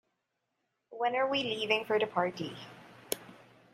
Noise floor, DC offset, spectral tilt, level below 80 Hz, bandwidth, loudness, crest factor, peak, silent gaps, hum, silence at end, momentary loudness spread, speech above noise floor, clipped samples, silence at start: -83 dBFS; under 0.1%; -3.5 dB/octave; -78 dBFS; 15.5 kHz; -32 LUFS; 24 dB; -12 dBFS; none; none; 0.4 s; 16 LU; 51 dB; under 0.1%; 0.9 s